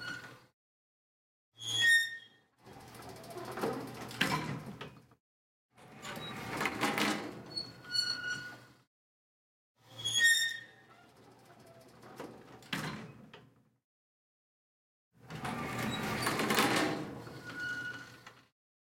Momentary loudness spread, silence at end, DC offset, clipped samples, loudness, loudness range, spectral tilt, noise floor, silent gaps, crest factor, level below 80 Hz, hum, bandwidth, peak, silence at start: 23 LU; 0.5 s; under 0.1%; under 0.1%; -33 LUFS; 14 LU; -2.5 dB/octave; -62 dBFS; 0.53-1.52 s, 5.20-5.69 s, 8.87-9.75 s, 13.84-15.11 s; 26 dB; -70 dBFS; none; 16.5 kHz; -12 dBFS; 0 s